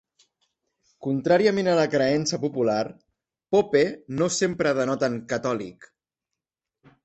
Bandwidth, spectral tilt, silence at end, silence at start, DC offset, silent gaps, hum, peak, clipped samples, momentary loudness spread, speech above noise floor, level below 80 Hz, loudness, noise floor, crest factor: 8.4 kHz; -5 dB/octave; 1.2 s; 1 s; under 0.1%; none; none; -6 dBFS; under 0.1%; 9 LU; 64 dB; -64 dBFS; -24 LUFS; -87 dBFS; 18 dB